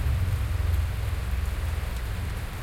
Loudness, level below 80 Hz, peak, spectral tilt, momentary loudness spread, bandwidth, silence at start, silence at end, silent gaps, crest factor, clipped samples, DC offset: -30 LUFS; -30 dBFS; -16 dBFS; -5.5 dB/octave; 5 LU; 16.5 kHz; 0 s; 0 s; none; 12 dB; under 0.1%; under 0.1%